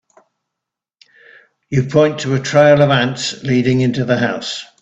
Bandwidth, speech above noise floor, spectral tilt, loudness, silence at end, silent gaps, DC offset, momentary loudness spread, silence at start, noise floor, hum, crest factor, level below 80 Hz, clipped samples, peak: 8.4 kHz; 68 dB; -5.5 dB/octave; -15 LUFS; 0.15 s; none; under 0.1%; 10 LU; 1.7 s; -82 dBFS; none; 16 dB; -52 dBFS; under 0.1%; 0 dBFS